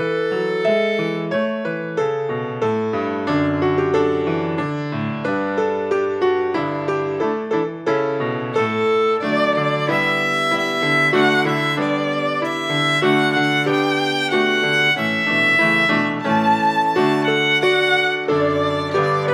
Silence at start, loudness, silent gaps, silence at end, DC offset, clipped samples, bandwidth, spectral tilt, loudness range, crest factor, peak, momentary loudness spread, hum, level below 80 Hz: 0 s; -18 LUFS; none; 0 s; under 0.1%; under 0.1%; 15.5 kHz; -5.5 dB/octave; 4 LU; 14 dB; -4 dBFS; 7 LU; none; -64 dBFS